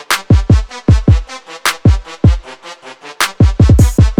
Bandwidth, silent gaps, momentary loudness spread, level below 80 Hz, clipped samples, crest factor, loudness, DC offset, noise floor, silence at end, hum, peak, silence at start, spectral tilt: 17.5 kHz; none; 22 LU; -16 dBFS; under 0.1%; 10 dB; -12 LUFS; under 0.1%; -33 dBFS; 0.05 s; none; 0 dBFS; 0.1 s; -6 dB/octave